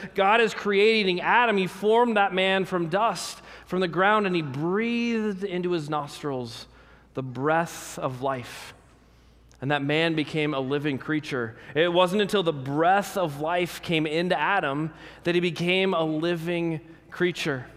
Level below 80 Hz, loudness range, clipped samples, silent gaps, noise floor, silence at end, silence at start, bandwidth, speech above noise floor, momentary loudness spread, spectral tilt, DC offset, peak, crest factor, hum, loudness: -60 dBFS; 7 LU; under 0.1%; none; -55 dBFS; 0 s; 0 s; 16 kHz; 30 dB; 12 LU; -5.5 dB/octave; under 0.1%; -6 dBFS; 18 dB; none; -25 LUFS